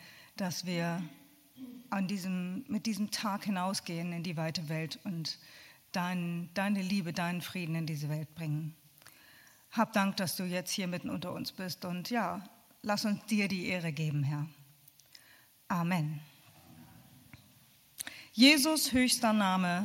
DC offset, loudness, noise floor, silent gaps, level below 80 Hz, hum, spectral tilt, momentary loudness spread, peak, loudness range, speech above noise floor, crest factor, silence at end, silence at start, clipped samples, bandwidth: under 0.1%; -33 LUFS; -63 dBFS; none; -70 dBFS; none; -4.5 dB/octave; 13 LU; -10 dBFS; 7 LU; 30 dB; 24 dB; 0 s; 0 s; under 0.1%; 17 kHz